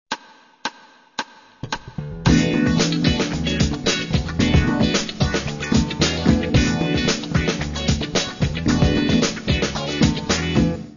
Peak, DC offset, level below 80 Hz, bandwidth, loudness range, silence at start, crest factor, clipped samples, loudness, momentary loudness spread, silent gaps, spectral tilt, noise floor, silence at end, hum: -2 dBFS; under 0.1%; -32 dBFS; 7.4 kHz; 2 LU; 0.1 s; 18 dB; under 0.1%; -20 LUFS; 13 LU; none; -5 dB/octave; -48 dBFS; 0 s; none